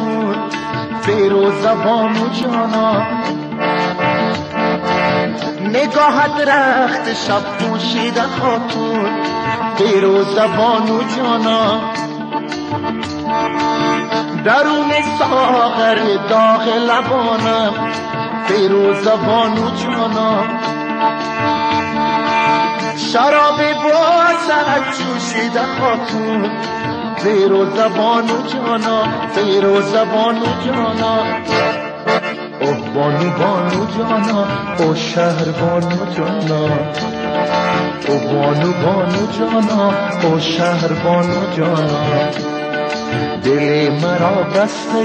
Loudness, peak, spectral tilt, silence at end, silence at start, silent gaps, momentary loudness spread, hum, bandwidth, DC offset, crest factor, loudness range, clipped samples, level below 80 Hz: -15 LUFS; -2 dBFS; -5.5 dB/octave; 0 s; 0 s; none; 7 LU; none; 9.4 kHz; under 0.1%; 14 dB; 3 LU; under 0.1%; -52 dBFS